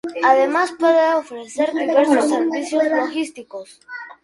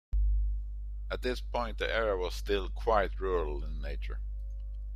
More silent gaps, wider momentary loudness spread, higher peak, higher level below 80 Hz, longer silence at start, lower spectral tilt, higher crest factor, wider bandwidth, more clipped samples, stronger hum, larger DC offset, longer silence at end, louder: neither; first, 19 LU vs 12 LU; first, -2 dBFS vs -12 dBFS; second, -68 dBFS vs -34 dBFS; about the same, 0.05 s vs 0.1 s; second, -3 dB/octave vs -6 dB/octave; about the same, 18 dB vs 20 dB; about the same, 11.5 kHz vs 12 kHz; neither; second, none vs 50 Hz at -35 dBFS; neither; first, 0.15 s vs 0 s; first, -18 LUFS vs -34 LUFS